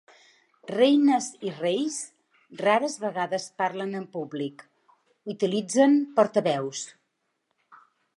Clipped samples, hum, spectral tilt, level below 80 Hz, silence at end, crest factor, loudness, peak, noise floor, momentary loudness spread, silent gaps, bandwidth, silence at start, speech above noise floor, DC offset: under 0.1%; none; -4.5 dB/octave; -82 dBFS; 0.4 s; 20 dB; -25 LUFS; -6 dBFS; -77 dBFS; 15 LU; none; 11.5 kHz; 0.7 s; 52 dB; under 0.1%